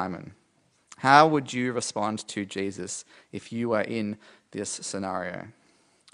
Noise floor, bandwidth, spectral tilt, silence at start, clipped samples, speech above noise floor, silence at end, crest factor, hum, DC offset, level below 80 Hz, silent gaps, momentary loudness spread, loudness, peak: -67 dBFS; 11 kHz; -4 dB/octave; 0 s; under 0.1%; 40 dB; 0.65 s; 26 dB; none; under 0.1%; -74 dBFS; none; 22 LU; -26 LUFS; -2 dBFS